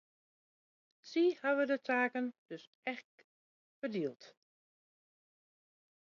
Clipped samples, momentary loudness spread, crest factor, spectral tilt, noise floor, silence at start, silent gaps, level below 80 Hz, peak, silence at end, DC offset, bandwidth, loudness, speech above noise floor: under 0.1%; 14 LU; 20 dB; -3 dB/octave; under -90 dBFS; 1.05 s; 2.38-2.46 s, 2.67-2.83 s, 3.04-3.18 s, 3.24-3.82 s; under -90 dBFS; -20 dBFS; 1.75 s; under 0.1%; 7.2 kHz; -36 LUFS; over 54 dB